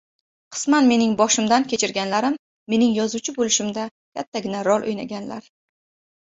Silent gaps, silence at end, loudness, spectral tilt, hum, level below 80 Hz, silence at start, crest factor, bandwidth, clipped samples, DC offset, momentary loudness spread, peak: 2.39-2.66 s, 3.91-4.12 s, 4.27-4.32 s; 0.8 s; -21 LUFS; -3 dB/octave; none; -62 dBFS; 0.5 s; 18 dB; 8 kHz; under 0.1%; under 0.1%; 15 LU; -4 dBFS